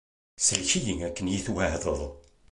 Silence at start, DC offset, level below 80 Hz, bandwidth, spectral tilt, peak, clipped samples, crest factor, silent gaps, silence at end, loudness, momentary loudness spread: 0.4 s; under 0.1%; -44 dBFS; 11.5 kHz; -3 dB/octave; -4 dBFS; under 0.1%; 24 dB; none; 0.3 s; -27 LUFS; 8 LU